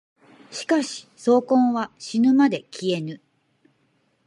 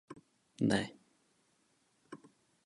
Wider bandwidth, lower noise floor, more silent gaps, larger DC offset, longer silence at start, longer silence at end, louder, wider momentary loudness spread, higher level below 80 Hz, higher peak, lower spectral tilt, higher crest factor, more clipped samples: about the same, 11.5 kHz vs 11.5 kHz; second, -67 dBFS vs -75 dBFS; neither; neither; first, 0.5 s vs 0.1 s; first, 1.1 s vs 0.5 s; first, -22 LUFS vs -35 LUFS; second, 16 LU vs 24 LU; second, -76 dBFS vs -70 dBFS; first, -6 dBFS vs -16 dBFS; about the same, -5 dB/octave vs -5.5 dB/octave; second, 16 dB vs 26 dB; neither